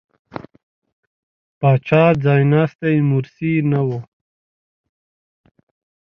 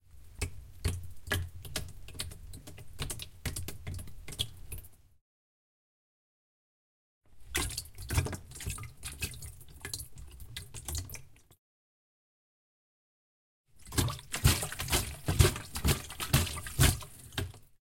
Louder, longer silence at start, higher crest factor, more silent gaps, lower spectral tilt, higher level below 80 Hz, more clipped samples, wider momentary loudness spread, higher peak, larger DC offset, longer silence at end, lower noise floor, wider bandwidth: first, -17 LUFS vs -34 LUFS; first, 0.35 s vs 0.05 s; second, 20 dB vs 28 dB; second, 0.63-0.82 s, 0.92-1.61 s, 2.75-2.79 s vs 5.21-7.21 s, 11.58-13.64 s; first, -10 dB/octave vs -3.5 dB/octave; second, -56 dBFS vs -44 dBFS; neither; first, 22 LU vs 19 LU; first, 0 dBFS vs -8 dBFS; neither; first, 2 s vs 0.15 s; about the same, under -90 dBFS vs under -90 dBFS; second, 5.6 kHz vs 17 kHz